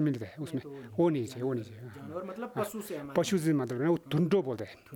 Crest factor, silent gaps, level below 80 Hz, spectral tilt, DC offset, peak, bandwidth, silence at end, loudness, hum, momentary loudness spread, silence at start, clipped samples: 18 dB; none; -70 dBFS; -6.5 dB/octave; under 0.1%; -12 dBFS; 19.5 kHz; 0 s; -32 LUFS; none; 12 LU; 0 s; under 0.1%